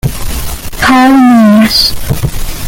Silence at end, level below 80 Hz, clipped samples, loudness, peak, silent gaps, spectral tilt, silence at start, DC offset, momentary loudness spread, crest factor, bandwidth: 0 s; -20 dBFS; under 0.1%; -7 LUFS; 0 dBFS; none; -4.5 dB/octave; 0.05 s; under 0.1%; 14 LU; 8 dB; 17.5 kHz